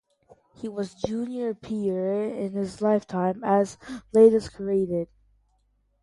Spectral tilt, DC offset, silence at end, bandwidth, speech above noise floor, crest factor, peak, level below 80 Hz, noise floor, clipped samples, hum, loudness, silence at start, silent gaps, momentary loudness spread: -7.5 dB/octave; under 0.1%; 0.95 s; 11.5 kHz; 44 dB; 20 dB; -6 dBFS; -58 dBFS; -68 dBFS; under 0.1%; none; -25 LUFS; 0.6 s; none; 15 LU